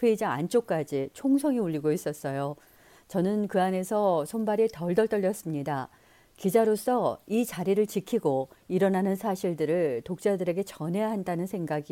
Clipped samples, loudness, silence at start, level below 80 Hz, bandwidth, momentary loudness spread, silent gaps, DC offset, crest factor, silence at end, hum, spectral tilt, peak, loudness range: under 0.1%; -28 LUFS; 0 s; -66 dBFS; 17 kHz; 7 LU; none; under 0.1%; 16 dB; 0.1 s; none; -6.5 dB/octave; -10 dBFS; 2 LU